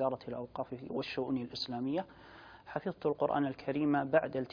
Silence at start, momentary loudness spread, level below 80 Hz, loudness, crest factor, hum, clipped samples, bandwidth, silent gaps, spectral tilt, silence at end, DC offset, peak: 0 s; 12 LU; -68 dBFS; -35 LUFS; 20 dB; none; under 0.1%; 5.2 kHz; none; -4.5 dB/octave; 0 s; under 0.1%; -14 dBFS